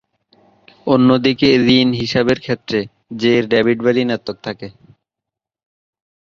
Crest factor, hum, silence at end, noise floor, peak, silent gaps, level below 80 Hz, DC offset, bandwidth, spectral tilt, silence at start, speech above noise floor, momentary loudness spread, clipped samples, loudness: 16 dB; none; 1.7 s; -84 dBFS; 0 dBFS; none; -52 dBFS; under 0.1%; 7.2 kHz; -6.5 dB/octave; 0.85 s; 69 dB; 16 LU; under 0.1%; -15 LUFS